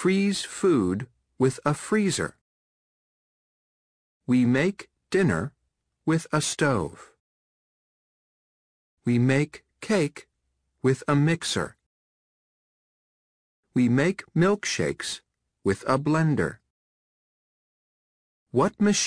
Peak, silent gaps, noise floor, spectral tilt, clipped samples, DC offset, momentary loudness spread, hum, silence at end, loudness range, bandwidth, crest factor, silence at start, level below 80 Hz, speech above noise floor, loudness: -8 dBFS; 2.41-4.21 s, 7.20-8.97 s, 11.86-13.63 s, 16.70-18.46 s; -76 dBFS; -5.5 dB/octave; under 0.1%; under 0.1%; 11 LU; none; 0 s; 4 LU; 10.5 kHz; 20 dB; 0 s; -58 dBFS; 53 dB; -25 LUFS